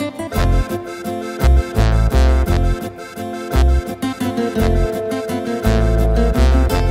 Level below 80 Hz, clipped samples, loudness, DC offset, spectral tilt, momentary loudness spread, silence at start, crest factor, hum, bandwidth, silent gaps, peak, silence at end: -18 dBFS; under 0.1%; -18 LUFS; under 0.1%; -7 dB/octave; 10 LU; 0 s; 14 dB; none; 16 kHz; none; 0 dBFS; 0 s